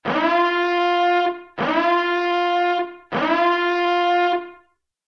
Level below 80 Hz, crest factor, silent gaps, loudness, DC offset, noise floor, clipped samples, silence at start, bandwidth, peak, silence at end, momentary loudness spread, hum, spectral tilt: -64 dBFS; 14 dB; none; -20 LUFS; under 0.1%; -58 dBFS; under 0.1%; 0.05 s; 6.6 kHz; -6 dBFS; 0.55 s; 7 LU; none; -5.5 dB/octave